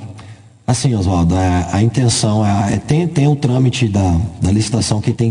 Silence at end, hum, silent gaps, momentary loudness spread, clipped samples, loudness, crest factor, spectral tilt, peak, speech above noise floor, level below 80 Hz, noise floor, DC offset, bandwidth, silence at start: 0 s; none; none; 3 LU; under 0.1%; -15 LUFS; 14 dB; -6 dB/octave; -2 dBFS; 24 dB; -38 dBFS; -37 dBFS; under 0.1%; 10.5 kHz; 0 s